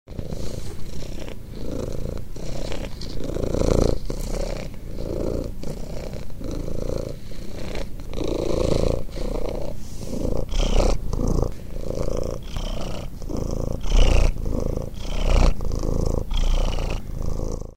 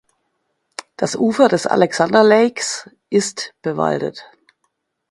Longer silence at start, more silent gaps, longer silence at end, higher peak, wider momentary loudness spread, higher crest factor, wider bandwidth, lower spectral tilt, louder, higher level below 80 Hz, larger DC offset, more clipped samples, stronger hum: second, 0.1 s vs 1 s; neither; second, 0.05 s vs 0.85 s; about the same, -2 dBFS vs 0 dBFS; second, 12 LU vs 15 LU; about the same, 20 dB vs 18 dB; first, 15 kHz vs 11.5 kHz; first, -6 dB/octave vs -4.5 dB/octave; second, -28 LUFS vs -17 LUFS; first, -26 dBFS vs -62 dBFS; neither; neither; neither